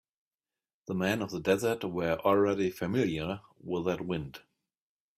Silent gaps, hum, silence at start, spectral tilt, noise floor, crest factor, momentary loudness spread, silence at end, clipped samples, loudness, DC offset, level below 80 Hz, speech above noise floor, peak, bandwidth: none; none; 0.9 s; -6 dB/octave; under -90 dBFS; 20 dB; 11 LU; 0.8 s; under 0.1%; -31 LUFS; under 0.1%; -62 dBFS; over 60 dB; -12 dBFS; 16 kHz